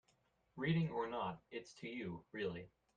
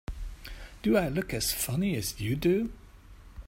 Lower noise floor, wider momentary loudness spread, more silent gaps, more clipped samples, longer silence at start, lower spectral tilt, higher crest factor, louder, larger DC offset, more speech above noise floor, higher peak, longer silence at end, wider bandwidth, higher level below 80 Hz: first, -78 dBFS vs -51 dBFS; second, 13 LU vs 17 LU; neither; neither; first, 0.55 s vs 0.1 s; first, -7 dB/octave vs -5 dB/octave; about the same, 18 dB vs 18 dB; second, -43 LUFS vs -29 LUFS; neither; first, 36 dB vs 22 dB; second, -26 dBFS vs -12 dBFS; first, 0.3 s vs 0.05 s; second, 7.4 kHz vs 16.5 kHz; second, -74 dBFS vs -44 dBFS